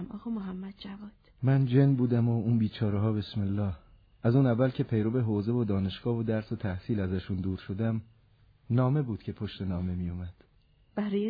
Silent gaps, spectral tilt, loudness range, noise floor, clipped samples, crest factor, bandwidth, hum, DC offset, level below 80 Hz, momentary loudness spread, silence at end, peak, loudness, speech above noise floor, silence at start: none; -11 dB/octave; 5 LU; -64 dBFS; under 0.1%; 16 dB; 5 kHz; none; under 0.1%; -56 dBFS; 14 LU; 0 s; -14 dBFS; -30 LUFS; 35 dB; 0 s